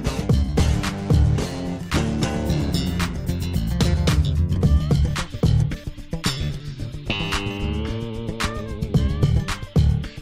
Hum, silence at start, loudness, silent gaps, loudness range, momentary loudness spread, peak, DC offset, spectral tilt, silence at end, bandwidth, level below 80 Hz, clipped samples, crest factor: none; 0 s; -23 LUFS; none; 4 LU; 9 LU; -8 dBFS; under 0.1%; -6 dB/octave; 0 s; 16 kHz; -26 dBFS; under 0.1%; 14 dB